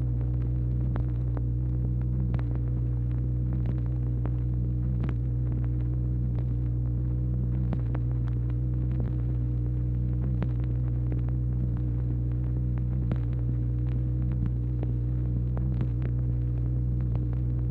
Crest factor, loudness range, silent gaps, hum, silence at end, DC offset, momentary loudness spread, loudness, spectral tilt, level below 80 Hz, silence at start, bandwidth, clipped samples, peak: 14 dB; 0 LU; none; none; 0 s; under 0.1%; 1 LU; -29 LUFS; -12 dB/octave; -32 dBFS; 0 s; 2.7 kHz; under 0.1%; -14 dBFS